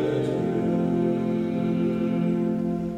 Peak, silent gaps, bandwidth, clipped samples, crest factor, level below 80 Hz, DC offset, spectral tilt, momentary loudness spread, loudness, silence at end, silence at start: -12 dBFS; none; 8.8 kHz; under 0.1%; 12 dB; -52 dBFS; under 0.1%; -9 dB/octave; 2 LU; -25 LUFS; 0 s; 0 s